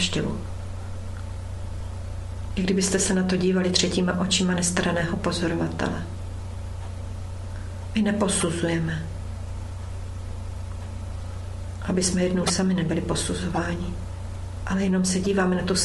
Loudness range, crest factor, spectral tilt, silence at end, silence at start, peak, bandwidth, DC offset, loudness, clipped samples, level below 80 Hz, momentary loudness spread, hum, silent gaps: 6 LU; 20 dB; -4.5 dB/octave; 0 s; 0 s; -4 dBFS; 12 kHz; under 0.1%; -26 LUFS; under 0.1%; -36 dBFS; 13 LU; none; none